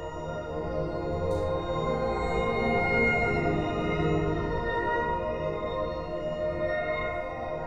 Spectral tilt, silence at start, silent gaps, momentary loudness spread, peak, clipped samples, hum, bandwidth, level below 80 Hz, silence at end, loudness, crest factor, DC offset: -7 dB/octave; 0 s; none; 9 LU; -14 dBFS; under 0.1%; none; 10 kHz; -42 dBFS; 0 s; -29 LUFS; 16 dB; under 0.1%